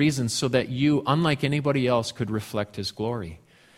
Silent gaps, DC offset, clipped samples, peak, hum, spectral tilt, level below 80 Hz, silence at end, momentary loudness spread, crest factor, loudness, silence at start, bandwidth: none; under 0.1%; under 0.1%; -6 dBFS; none; -5.5 dB/octave; -54 dBFS; 0.4 s; 8 LU; 18 dB; -25 LUFS; 0 s; 15.5 kHz